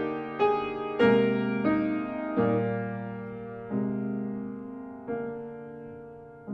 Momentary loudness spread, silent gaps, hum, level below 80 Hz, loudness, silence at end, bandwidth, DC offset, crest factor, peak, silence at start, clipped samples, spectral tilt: 17 LU; none; none; -62 dBFS; -29 LUFS; 0 s; 5.8 kHz; under 0.1%; 18 dB; -10 dBFS; 0 s; under 0.1%; -9 dB/octave